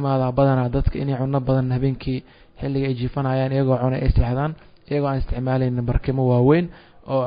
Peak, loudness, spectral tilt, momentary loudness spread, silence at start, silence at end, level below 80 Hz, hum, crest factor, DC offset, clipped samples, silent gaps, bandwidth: -4 dBFS; -22 LUFS; -13 dB/octave; 9 LU; 0 s; 0 s; -30 dBFS; none; 18 dB; under 0.1%; under 0.1%; none; 5.2 kHz